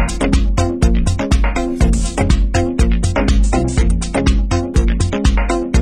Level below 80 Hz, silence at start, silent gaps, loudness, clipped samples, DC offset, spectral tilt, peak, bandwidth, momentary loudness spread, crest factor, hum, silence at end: -16 dBFS; 0 s; none; -16 LUFS; under 0.1%; under 0.1%; -6 dB/octave; 0 dBFS; 10 kHz; 2 LU; 14 dB; none; 0 s